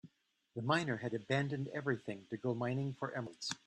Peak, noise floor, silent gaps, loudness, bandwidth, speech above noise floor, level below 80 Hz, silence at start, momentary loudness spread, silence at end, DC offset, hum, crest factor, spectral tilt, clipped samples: -18 dBFS; -74 dBFS; none; -39 LUFS; 10.5 kHz; 36 dB; -78 dBFS; 0.05 s; 7 LU; 0.1 s; under 0.1%; none; 20 dB; -5.5 dB/octave; under 0.1%